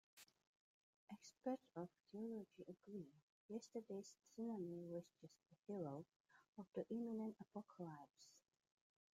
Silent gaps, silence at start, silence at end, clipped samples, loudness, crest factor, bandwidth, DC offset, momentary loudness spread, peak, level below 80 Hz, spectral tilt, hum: 0.47-1.08 s, 2.00-2.04 s, 3.22-3.49 s, 5.59-5.63 s, 6.16-6.24 s, 6.48-6.53 s; 0.15 s; 0.75 s; under 0.1%; -54 LUFS; 20 dB; 15 kHz; under 0.1%; 17 LU; -34 dBFS; under -90 dBFS; -7 dB/octave; none